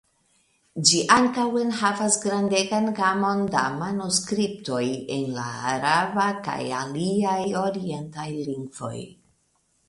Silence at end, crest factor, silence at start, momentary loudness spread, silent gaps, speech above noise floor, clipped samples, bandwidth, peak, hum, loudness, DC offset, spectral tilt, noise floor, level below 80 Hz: 0.8 s; 22 dB; 0.75 s; 13 LU; none; 44 dB; under 0.1%; 11.5 kHz; -2 dBFS; none; -24 LUFS; under 0.1%; -3.5 dB/octave; -68 dBFS; -64 dBFS